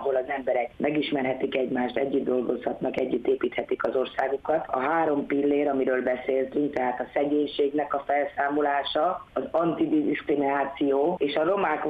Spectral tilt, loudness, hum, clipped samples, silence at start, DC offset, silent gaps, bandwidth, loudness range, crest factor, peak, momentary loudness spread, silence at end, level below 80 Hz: -7.5 dB/octave; -26 LUFS; none; under 0.1%; 0 s; under 0.1%; none; 5 kHz; 2 LU; 16 dB; -10 dBFS; 4 LU; 0 s; -62 dBFS